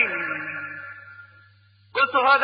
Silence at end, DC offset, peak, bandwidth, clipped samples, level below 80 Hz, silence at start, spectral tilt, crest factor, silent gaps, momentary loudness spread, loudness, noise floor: 0 s; under 0.1%; -6 dBFS; 5 kHz; under 0.1%; -76 dBFS; 0 s; 0.5 dB/octave; 18 dB; none; 22 LU; -24 LUFS; -56 dBFS